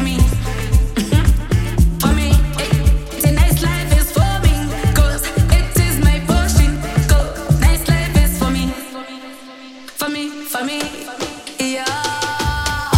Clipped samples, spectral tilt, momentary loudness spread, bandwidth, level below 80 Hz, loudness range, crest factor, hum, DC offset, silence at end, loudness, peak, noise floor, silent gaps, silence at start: under 0.1%; -5 dB/octave; 11 LU; 16.5 kHz; -18 dBFS; 7 LU; 14 dB; none; under 0.1%; 0 s; -17 LUFS; 0 dBFS; -36 dBFS; none; 0 s